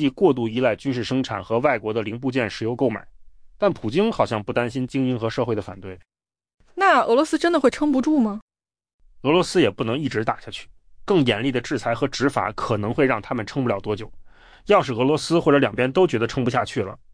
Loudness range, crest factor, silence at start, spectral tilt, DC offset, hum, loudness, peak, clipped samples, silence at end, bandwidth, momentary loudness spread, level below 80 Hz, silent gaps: 3 LU; 16 dB; 0 s; -6 dB/octave; under 0.1%; none; -22 LUFS; -6 dBFS; under 0.1%; 0.15 s; 10.5 kHz; 10 LU; -50 dBFS; 6.54-6.58 s, 8.42-8.48 s, 8.94-8.99 s